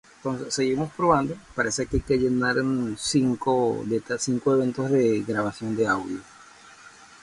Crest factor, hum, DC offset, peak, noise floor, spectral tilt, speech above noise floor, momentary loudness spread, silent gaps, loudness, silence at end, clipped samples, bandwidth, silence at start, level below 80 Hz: 18 dB; none; under 0.1%; -6 dBFS; -49 dBFS; -5 dB/octave; 25 dB; 6 LU; none; -24 LUFS; 0.35 s; under 0.1%; 11.5 kHz; 0.25 s; -46 dBFS